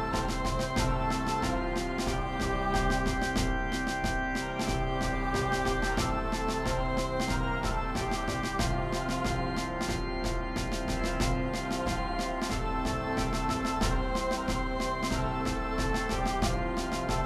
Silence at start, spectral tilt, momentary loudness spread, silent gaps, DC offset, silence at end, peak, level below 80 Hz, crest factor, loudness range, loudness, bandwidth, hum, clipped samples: 0 s; -5 dB/octave; 3 LU; none; under 0.1%; 0 s; -16 dBFS; -36 dBFS; 14 dB; 2 LU; -31 LUFS; 14 kHz; none; under 0.1%